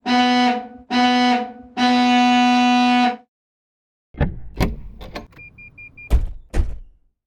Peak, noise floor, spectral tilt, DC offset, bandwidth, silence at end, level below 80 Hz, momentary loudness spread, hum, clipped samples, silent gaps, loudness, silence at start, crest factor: -4 dBFS; -43 dBFS; -5 dB/octave; under 0.1%; 10 kHz; 0.45 s; -30 dBFS; 21 LU; none; under 0.1%; 3.28-4.14 s; -18 LUFS; 0.05 s; 16 dB